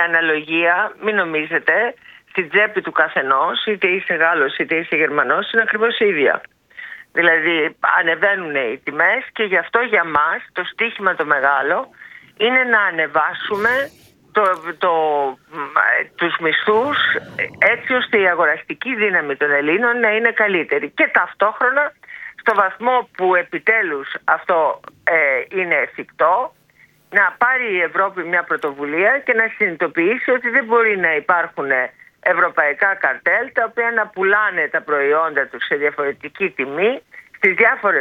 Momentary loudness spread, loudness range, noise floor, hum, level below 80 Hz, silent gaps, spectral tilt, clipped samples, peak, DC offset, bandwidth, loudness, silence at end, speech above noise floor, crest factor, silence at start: 7 LU; 2 LU; -53 dBFS; none; -66 dBFS; none; -5.5 dB/octave; under 0.1%; 0 dBFS; under 0.1%; 7.2 kHz; -17 LUFS; 0 s; 36 dB; 18 dB; 0 s